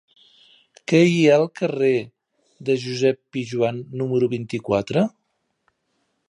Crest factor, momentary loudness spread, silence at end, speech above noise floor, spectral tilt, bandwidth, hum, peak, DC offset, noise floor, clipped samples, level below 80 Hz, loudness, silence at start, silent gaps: 18 dB; 12 LU; 1.2 s; 51 dB; -6.5 dB/octave; 10.5 kHz; none; -4 dBFS; under 0.1%; -71 dBFS; under 0.1%; -62 dBFS; -21 LUFS; 0.9 s; none